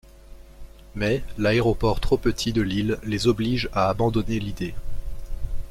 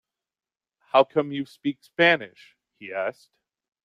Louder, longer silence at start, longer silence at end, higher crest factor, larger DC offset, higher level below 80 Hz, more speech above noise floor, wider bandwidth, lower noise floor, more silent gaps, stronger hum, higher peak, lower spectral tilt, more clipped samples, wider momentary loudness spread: about the same, -24 LUFS vs -24 LUFS; second, 0.05 s vs 0.95 s; second, 0 s vs 0.75 s; second, 16 dB vs 22 dB; neither; first, -34 dBFS vs -74 dBFS; second, 22 dB vs over 66 dB; first, 15.5 kHz vs 11.5 kHz; second, -44 dBFS vs under -90 dBFS; neither; neither; about the same, -6 dBFS vs -4 dBFS; about the same, -6 dB/octave vs -6 dB/octave; neither; about the same, 16 LU vs 15 LU